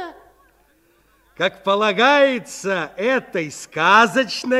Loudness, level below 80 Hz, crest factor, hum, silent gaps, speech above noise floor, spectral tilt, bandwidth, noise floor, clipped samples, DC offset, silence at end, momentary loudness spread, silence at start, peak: -18 LUFS; -64 dBFS; 18 dB; none; none; 40 dB; -3.5 dB/octave; 14 kHz; -58 dBFS; under 0.1%; under 0.1%; 0 s; 13 LU; 0 s; -2 dBFS